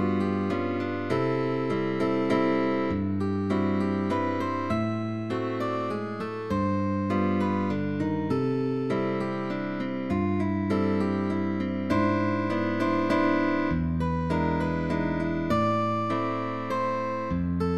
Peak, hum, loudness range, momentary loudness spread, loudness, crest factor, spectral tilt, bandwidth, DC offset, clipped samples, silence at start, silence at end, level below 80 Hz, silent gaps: -12 dBFS; none; 2 LU; 5 LU; -27 LUFS; 14 dB; -8 dB/octave; 11.5 kHz; 0.5%; under 0.1%; 0 s; 0 s; -48 dBFS; none